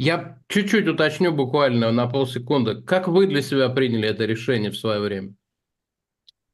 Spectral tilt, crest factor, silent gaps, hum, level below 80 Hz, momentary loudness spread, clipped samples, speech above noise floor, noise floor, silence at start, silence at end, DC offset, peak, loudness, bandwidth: -6 dB/octave; 16 dB; none; none; -64 dBFS; 6 LU; under 0.1%; 63 dB; -84 dBFS; 0 s; 1.2 s; under 0.1%; -6 dBFS; -21 LUFS; 12.5 kHz